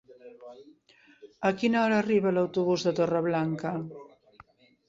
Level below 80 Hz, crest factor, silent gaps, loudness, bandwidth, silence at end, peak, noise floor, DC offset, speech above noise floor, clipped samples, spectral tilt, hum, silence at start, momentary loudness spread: -68 dBFS; 18 dB; none; -27 LUFS; 7.8 kHz; 0.85 s; -10 dBFS; -58 dBFS; under 0.1%; 31 dB; under 0.1%; -6.5 dB/octave; none; 0.1 s; 24 LU